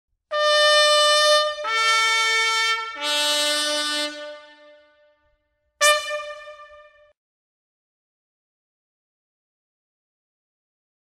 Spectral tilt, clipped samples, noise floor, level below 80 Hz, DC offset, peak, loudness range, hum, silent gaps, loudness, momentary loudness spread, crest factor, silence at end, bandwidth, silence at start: 2 dB/octave; under 0.1%; -70 dBFS; -68 dBFS; under 0.1%; -2 dBFS; 9 LU; none; none; -18 LUFS; 15 LU; 22 dB; 4.45 s; 16 kHz; 0.3 s